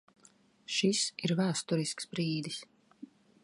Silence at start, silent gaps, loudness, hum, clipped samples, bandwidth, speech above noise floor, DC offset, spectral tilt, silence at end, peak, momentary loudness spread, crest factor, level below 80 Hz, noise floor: 0.7 s; none; -32 LUFS; none; under 0.1%; 11.5 kHz; 32 dB; under 0.1%; -4 dB/octave; 0.4 s; -16 dBFS; 11 LU; 18 dB; -78 dBFS; -64 dBFS